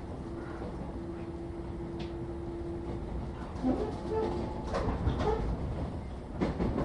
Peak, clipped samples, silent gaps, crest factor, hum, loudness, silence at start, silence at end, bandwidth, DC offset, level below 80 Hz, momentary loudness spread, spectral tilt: -16 dBFS; under 0.1%; none; 18 dB; none; -36 LUFS; 0 s; 0 s; 11 kHz; under 0.1%; -40 dBFS; 8 LU; -8 dB/octave